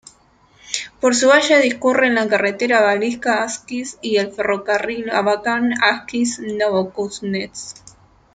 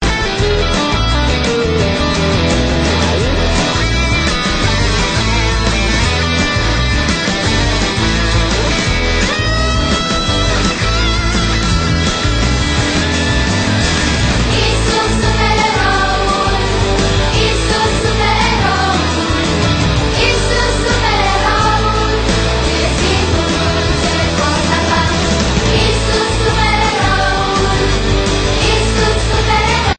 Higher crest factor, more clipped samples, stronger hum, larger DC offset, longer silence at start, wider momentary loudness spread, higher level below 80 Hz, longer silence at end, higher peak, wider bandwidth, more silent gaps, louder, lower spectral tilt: first, 18 dB vs 12 dB; neither; neither; neither; first, 0.65 s vs 0 s; first, 12 LU vs 2 LU; second, -58 dBFS vs -20 dBFS; first, 0.6 s vs 0.05 s; about the same, -2 dBFS vs 0 dBFS; about the same, 9.6 kHz vs 9.2 kHz; neither; second, -18 LUFS vs -13 LUFS; about the same, -3 dB/octave vs -4 dB/octave